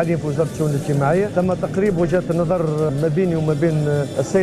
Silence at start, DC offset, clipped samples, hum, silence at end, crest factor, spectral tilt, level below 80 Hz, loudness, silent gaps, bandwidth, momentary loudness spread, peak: 0 s; under 0.1%; under 0.1%; none; 0 s; 12 dB; -7.5 dB/octave; -42 dBFS; -19 LUFS; none; 13 kHz; 3 LU; -6 dBFS